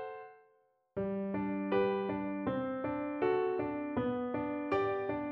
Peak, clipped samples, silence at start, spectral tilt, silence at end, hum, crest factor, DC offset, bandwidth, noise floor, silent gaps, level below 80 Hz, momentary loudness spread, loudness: -20 dBFS; under 0.1%; 0 s; -6 dB/octave; 0 s; none; 16 dB; under 0.1%; 5.8 kHz; -71 dBFS; none; -64 dBFS; 7 LU; -35 LUFS